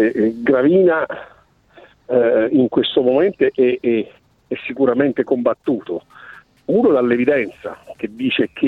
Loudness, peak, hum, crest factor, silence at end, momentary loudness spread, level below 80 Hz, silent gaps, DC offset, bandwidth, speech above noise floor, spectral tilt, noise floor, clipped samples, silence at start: -17 LUFS; -4 dBFS; none; 14 dB; 0 s; 15 LU; -58 dBFS; none; under 0.1%; 4.4 kHz; 31 dB; -8 dB/octave; -48 dBFS; under 0.1%; 0 s